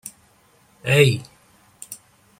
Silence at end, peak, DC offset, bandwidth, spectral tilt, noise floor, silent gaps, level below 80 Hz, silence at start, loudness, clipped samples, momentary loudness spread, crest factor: 0.45 s; -2 dBFS; under 0.1%; 16.5 kHz; -5 dB/octave; -57 dBFS; none; -58 dBFS; 0.05 s; -19 LUFS; under 0.1%; 23 LU; 22 dB